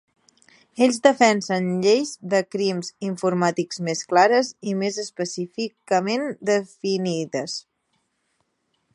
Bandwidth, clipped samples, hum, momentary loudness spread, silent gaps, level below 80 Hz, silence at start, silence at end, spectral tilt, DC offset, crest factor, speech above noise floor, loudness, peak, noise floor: 11.5 kHz; under 0.1%; none; 11 LU; none; -74 dBFS; 0.75 s; 1.35 s; -4.5 dB/octave; under 0.1%; 20 dB; 50 dB; -22 LUFS; -2 dBFS; -72 dBFS